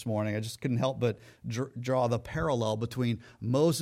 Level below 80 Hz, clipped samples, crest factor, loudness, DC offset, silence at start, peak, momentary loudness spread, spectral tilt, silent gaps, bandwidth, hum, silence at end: -56 dBFS; under 0.1%; 16 dB; -31 LUFS; under 0.1%; 0 s; -14 dBFS; 8 LU; -6.5 dB/octave; none; 16 kHz; none; 0 s